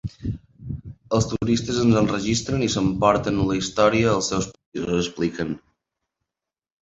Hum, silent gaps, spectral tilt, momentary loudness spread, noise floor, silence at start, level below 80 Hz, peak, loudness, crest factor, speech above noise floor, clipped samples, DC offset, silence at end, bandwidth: none; 4.66-4.72 s; -5.5 dB/octave; 15 LU; -88 dBFS; 0.05 s; -44 dBFS; -4 dBFS; -22 LUFS; 20 dB; 67 dB; under 0.1%; under 0.1%; 1.25 s; 8.2 kHz